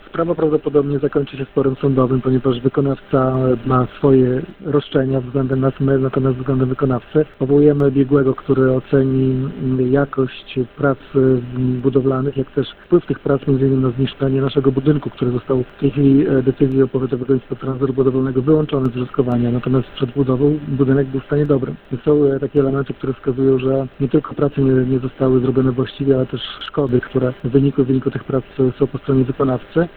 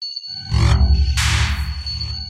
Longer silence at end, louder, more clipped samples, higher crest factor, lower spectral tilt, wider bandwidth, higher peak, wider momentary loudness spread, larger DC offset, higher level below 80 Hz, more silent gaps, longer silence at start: about the same, 0.1 s vs 0 s; about the same, -17 LUFS vs -19 LUFS; neither; about the same, 16 dB vs 14 dB; first, -11.5 dB/octave vs -4 dB/octave; second, 4.3 kHz vs 13.5 kHz; first, 0 dBFS vs -4 dBFS; second, 6 LU vs 9 LU; neither; second, -42 dBFS vs -20 dBFS; neither; first, 0.15 s vs 0 s